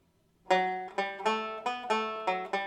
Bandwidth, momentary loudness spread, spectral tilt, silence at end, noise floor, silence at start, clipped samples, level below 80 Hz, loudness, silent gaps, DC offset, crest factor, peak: 12 kHz; 6 LU; -3.5 dB/octave; 0 s; -62 dBFS; 0.45 s; under 0.1%; -76 dBFS; -31 LUFS; none; under 0.1%; 20 dB; -12 dBFS